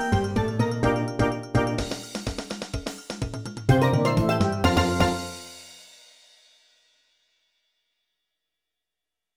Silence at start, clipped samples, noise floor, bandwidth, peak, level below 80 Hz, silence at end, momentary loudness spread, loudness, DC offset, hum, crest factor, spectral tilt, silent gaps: 0 s; under 0.1%; -87 dBFS; over 20 kHz; -4 dBFS; -42 dBFS; 3.5 s; 14 LU; -25 LUFS; under 0.1%; none; 22 dB; -6 dB/octave; none